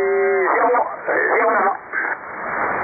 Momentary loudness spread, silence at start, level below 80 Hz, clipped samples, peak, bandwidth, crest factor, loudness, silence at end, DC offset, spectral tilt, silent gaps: 8 LU; 0 s; -60 dBFS; under 0.1%; -6 dBFS; 2.6 kHz; 12 dB; -19 LUFS; 0 s; under 0.1%; -11 dB/octave; none